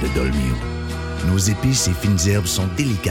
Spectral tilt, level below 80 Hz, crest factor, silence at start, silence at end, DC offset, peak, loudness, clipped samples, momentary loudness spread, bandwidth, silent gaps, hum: -4.5 dB/octave; -28 dBFS; 14 dB; 0 s; 0 s; under 0.1%; -6 dBFS; -20 LUFS; under 0.1%; 8 LU; 17 kHz; none; none